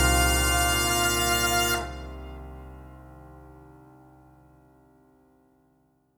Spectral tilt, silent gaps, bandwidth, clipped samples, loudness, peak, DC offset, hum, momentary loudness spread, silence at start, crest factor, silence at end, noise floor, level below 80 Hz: -2.5 dB/octave; none; over 20 kHz; under 0.1%; -23 LUFS; -10 dBFS; under 0.1%; none; 23 LU; 0 s; 20 dB; 2.55 s; -66 dBFS; -36 dBFS